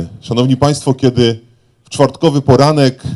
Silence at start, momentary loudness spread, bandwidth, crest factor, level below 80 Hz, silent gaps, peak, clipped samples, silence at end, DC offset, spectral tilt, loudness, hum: 0 s; 7 LU; 12 kHz; 12 dB; -38 dBFS; none; 0 dBFS; 0.4%; 0 s; under 0.1%; -6.5 dB/octave; -12 LUFS; none